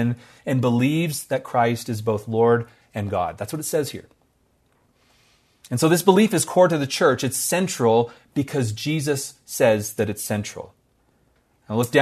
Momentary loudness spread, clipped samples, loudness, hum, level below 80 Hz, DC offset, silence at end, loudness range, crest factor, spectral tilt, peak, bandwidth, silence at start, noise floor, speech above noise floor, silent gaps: 12 LU; under 0.1%; -22 LUFS; none; -62 dBFS; under 0.1%; 0 s; 6 LU; 22 dB; -5 dB/octave; 0 dBFS; 14 kHz; 0 s; -64 dBFS; 43 dB; none